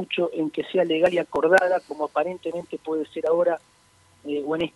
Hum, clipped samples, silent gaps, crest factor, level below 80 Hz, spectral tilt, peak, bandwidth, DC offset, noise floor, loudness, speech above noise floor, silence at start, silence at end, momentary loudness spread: none; under 0.1%; none; 20 dB; -64 dBFS; -5.5 dB/octave; -4 dBFS; 11.5 kHz; under 0.1%; -57 dBFS; -24 LUFS; 34 dB; 0 s; 0.05 s; 12 LU